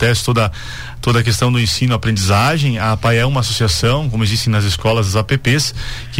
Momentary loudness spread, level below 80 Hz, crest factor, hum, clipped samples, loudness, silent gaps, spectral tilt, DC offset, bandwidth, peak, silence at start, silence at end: 4 LU; -32 dBFS; 10 dB; none; under 0.1%; -15 LUFS; none; -4.5 dB/octave; 2%; 16.5 kHz; -4 dBFS; 0 s; 0 s